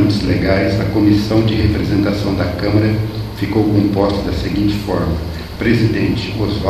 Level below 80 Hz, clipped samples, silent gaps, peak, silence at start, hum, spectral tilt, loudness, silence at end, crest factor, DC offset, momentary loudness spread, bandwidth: -28 dBFS; under 0.1%; none; 0 dBFS; 0 s; none; -7.5 dB/octave; -16 LUFS; 0 s; 14 dB; under 0.1%; 6 LU; 14 kHz